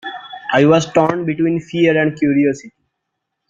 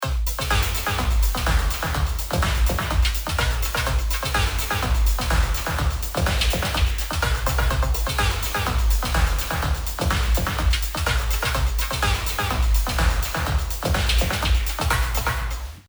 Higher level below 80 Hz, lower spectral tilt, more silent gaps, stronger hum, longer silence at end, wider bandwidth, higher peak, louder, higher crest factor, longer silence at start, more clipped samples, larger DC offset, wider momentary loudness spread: second, -56 dBFS vs -24 dBFS; first, -6.5 dB/octave vs -3.5 dB/octave; neither; neither; first, 0.8 s vs 0.05 s; second, 7.6 kHz vs over 20 kHz; first, -2 dBFS vs -6 dBFS; first, -15 LUFS vs -23 LUFS; about the same, 16 dB vs 14 dB; about the same, 0.05 s vs 0 s; neither; neither; first, 11 LU vs 3 LU